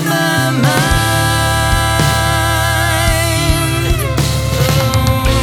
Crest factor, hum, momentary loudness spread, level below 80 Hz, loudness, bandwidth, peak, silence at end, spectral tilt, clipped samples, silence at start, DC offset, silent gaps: 12 dB; none; 2 LU; -22 dBFS; -13 LUFS; 19 kHz; -2 dBFS; 0 s; -4 dB/octave; under 0.1%; 0 s; under 0.1%; none